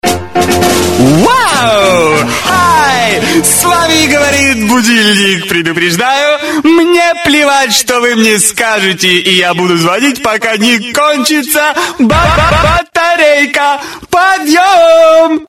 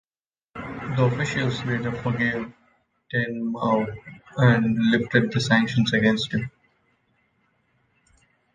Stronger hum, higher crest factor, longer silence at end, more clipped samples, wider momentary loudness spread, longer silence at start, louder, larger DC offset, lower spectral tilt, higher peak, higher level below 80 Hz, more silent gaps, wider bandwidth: neither; second, 8 dB vs 22 dB; second, 0.05 s vs 2.05 s; first, 0.9% vs under 0.1%; second, 4 LU vs 16 LU; second, 0.05 s vs 0.55 s; first, -7 LUFS vs -23 LUFS; neither; second, -3 dB/octave vs -6.5 dB/octave; first, 0 dBFS vs -4 dBFS; first, -30 dBFS vs -54 dBFS; neither; first, 17.5 kHz vs 9.4 kHz